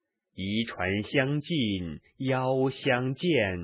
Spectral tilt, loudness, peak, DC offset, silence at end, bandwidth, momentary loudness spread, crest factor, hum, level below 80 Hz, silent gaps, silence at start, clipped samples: -4.5 dB/octave; -28 LUFS; -10 dBFS; under 0.1%; 0 s; 4 kHz; 8 LU; 18 dB; none; -52 dBFS; none; 0.35 s; under 0.1%